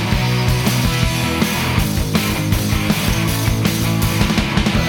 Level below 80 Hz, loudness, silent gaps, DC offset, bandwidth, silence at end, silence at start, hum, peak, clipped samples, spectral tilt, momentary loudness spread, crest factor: -26 dBFS; -17 LUFS; none; under 0.1%; 19.5 kHz; 0 s; 0 s; none; -2 dBFS; under 0.1%; -5 dB/octave; 1 LU; 14 dB